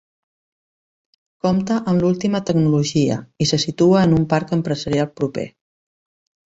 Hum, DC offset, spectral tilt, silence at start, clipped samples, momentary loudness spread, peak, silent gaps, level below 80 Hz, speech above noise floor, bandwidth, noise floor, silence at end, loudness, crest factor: none; under 0.1%; -6 dB/octave; 1.45 s; under 0.1%; 9 LU; -4 dBFS; none; -50 dBFS; over 72 dB; 8 kHz; under -90 dBFS; 1 s; -19 LUFS; 16 dB